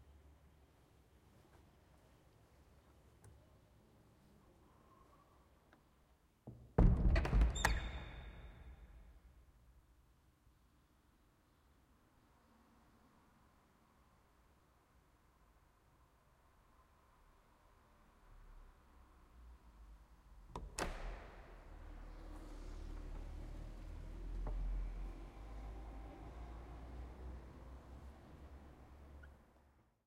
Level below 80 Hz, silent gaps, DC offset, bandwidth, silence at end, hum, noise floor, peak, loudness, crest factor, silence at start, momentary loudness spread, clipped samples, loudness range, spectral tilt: -48 dBFS; none; under 0.1%; 14.5 kHz; 0.7 s; none; -72 dBFS; -16 dBFS; -44 LUFS; 30 dB; 0 s; 29 LU; under 0.1%; 24 LU; -5.5 dB/octave